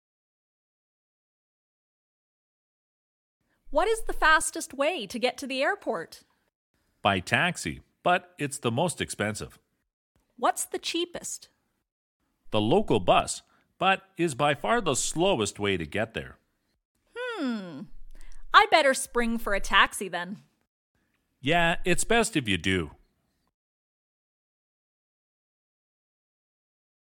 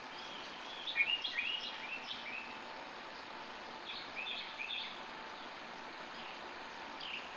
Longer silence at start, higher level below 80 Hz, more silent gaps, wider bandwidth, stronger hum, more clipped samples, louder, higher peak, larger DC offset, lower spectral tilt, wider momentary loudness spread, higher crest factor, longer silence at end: first, 3.65 s vs 0 s; first, -46 dBFS vs -76 dBFS; first, 6.55-6.74 s, 9.93-10.15 s, 11.92-12.20 s, 16.85-16.95 s, 20.67-20.95 s vs none; first, 17.5 kHz vs 8 kHz; neither; neither; first, -26 LUFS vs -41 LUFS; first, -2 dBFS vs -20 dBFS; neither; first, -3.5 dB/octave vs -1.5 dB/octave; about the same, 14 LU vs 13 LU; about the same, 26 dB vs 22 dB; first, 4.25 s vs 0 s